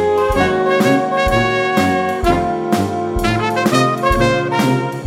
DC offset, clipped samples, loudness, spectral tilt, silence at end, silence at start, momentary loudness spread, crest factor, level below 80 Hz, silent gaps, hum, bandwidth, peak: under 0.1%; under 0.1%; -15 LUFS; -5.5 dB/octave; 0 s; 0 s; 3 LU; 14 dB; -30 dBFS; none; none; 16.5 kHz; 0 dBFS